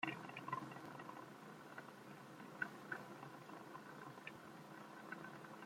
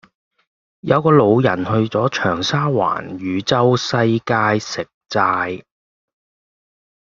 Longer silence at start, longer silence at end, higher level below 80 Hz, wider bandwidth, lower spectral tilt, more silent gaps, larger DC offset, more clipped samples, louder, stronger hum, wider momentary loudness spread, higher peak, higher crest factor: second, 0 s vs 0.85 s; second, 0 s vs 1.45 s; second, under -90 dBFS vs -56 dBFS; first, 16.5 kHz vs 7.6 kHz; about the same, -5 dB/octave vs -6 dB/octave; second, none vs 4.94-5.01 s; neither; neither; second, -53 LUFS vs -17 LUFS; neither; about the same, 9 LU vs 11 LU; second, -26 dBFS vs -2 dBFS; first, 26 dB vs 16 dB